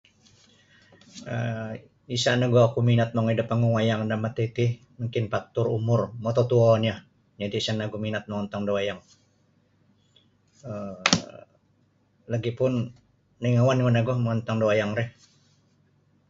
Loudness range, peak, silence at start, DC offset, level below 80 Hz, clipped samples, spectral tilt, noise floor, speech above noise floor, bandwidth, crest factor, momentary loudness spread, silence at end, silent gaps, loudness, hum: 7 LU; -2 dBFS; 1.15 s; under 0.1%; -58 dBFS; under 0.1%; -6 dB/octave; -65 dBFS; 41 dB; 7.8 kHz; 24 dB; 15 LU; 1.2 s; none; -25 LUFS; none